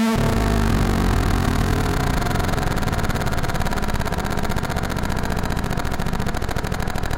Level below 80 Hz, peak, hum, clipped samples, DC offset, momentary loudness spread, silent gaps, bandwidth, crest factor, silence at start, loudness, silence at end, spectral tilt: -24 dBFS; -6 dBFS; none; under 0.1%; under 0.1%; 5 LU; none; 17 kHz; 14 dB; 0 s; -22 LUFS; 0 s; -5.5 dB/octave